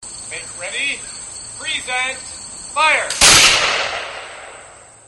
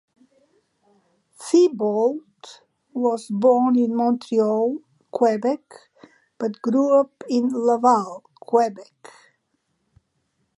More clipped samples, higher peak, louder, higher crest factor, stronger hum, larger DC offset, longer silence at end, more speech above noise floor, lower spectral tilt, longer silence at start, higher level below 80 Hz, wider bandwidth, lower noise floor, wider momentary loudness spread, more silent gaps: neither; first, 0 dBFS vs -4 dBFS; first, -14 LUFS vs -21 LUFS; about the same, 18 dB vs 18 dB; neither; neither; second, 0.25 s vs 1.5 s; second, 21 dB vs 52 dB; second, 0.5 dB/octave vs -6 dB/octave; second, 0 s vs 1.4 s; first, -44 dBFS vs -76 dBFS; first, 16 kHz vs 11.5 kHz; second, -41 dBFS vs -72 dBFS; first, 21 LU vs 16 LU; neither